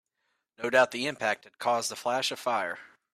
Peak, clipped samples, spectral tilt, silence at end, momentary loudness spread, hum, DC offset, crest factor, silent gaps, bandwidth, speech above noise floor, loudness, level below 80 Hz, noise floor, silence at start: -10 dBFS; under 0.1%; -2 dB/octave; 0.3 s; 10 LU; none; under 0.1%; 22 dB; none; 15.5 kHz; 50 dB; -29 LUFS; -80 dBFS; -79 dBFS; 0.6 s